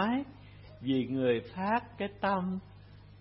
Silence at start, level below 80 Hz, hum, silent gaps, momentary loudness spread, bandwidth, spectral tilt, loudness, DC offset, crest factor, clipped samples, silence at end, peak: 0 s; -60 dBFS; 50 Hz at -55 dBFS; none; 14 LU; 5.8 kHz; -10 dB/octave; -33 LUFS; under 0.1%; 18 dB; under 0.1%; 0.15 s; -16 dBFS